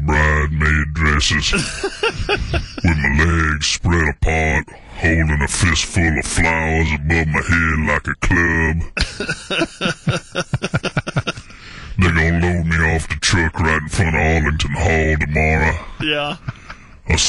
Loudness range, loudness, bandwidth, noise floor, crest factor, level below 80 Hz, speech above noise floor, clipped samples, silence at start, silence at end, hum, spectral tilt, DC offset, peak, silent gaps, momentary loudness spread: 3 LU; -17 LUFS; 11.5 kHz; -37 dBFS; 14 dB; -24 dBFS; 20 dB; under 0.1%; 0 s; 0 s; none; -4.5 dB/octave; under 0.1%; -4 dBFS; none; 8 LU